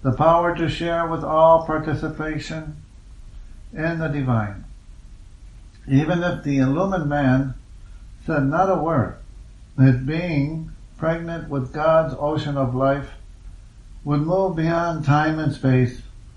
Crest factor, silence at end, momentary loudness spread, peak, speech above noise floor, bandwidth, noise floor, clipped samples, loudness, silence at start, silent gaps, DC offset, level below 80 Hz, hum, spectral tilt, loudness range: 18 dB; 0.05 s; 15 LU; -2 dBFS; 22 dB; 9.2 kHz; -42 dBFS; under 0.1%; -21 LUFS; 0 s; none; under 0.1%; -40 dBFS; none; -8 dB/octave; 5 LU